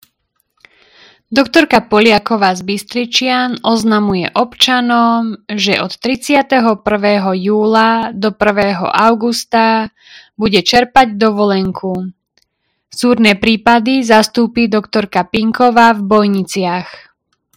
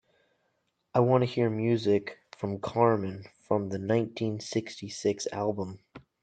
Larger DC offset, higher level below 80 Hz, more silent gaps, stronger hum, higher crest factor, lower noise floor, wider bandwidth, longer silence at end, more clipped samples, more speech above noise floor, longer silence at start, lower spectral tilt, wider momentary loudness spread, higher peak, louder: neither; first, -46 dBFS vs -70 dBFS; neither; neither; second, 12 dB vs 20 dB; second, -65 dBFS vs -76 dBFS; first, 16 kHz vs 9.2 kHz; first, 0.55 s vs 0.25 s; first, 0.5% vs under 0.1%; first, 53 dB vs 48 dB; first, 1.3 s vs 0.95 s; second, -4.5 dB/octave vs -6.5 dB/octave; second, 8 LU vs 13 LU; first, 0 dBFS vs -8 dBFS; first, -12 LUFS vs -29 LUFS